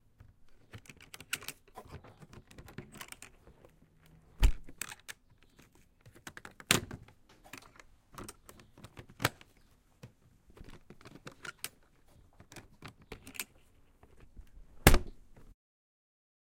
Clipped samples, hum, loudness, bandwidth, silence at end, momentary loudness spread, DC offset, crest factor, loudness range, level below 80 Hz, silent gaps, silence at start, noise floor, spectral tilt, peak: under 0.1%; none; -35 LUFS; 16.5 kHz; 1.45 s; 27 LU; under 0.1%; 36 dB; 15 LU; -42 dBFS; none; 0.75 s; -65 dBFS; -3.5 dB/octave; -2 dBFS